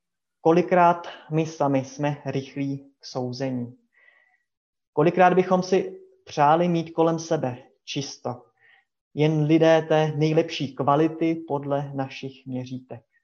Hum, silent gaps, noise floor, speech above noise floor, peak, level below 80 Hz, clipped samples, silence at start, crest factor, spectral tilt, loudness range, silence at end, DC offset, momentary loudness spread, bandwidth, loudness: none; 4.57-4.73 s, 4.87-4.93 s, 9.01-9.11 s; -61 dBFS; 39 dB; -4 dBFS; -70 dBFS; under 0.1%; 0.45 s; 20 dB; -6.5 dB/octave; 6 LU; 0.25 s; under 0.1%; 16 LU; 7.2 kHz; -23 LUFS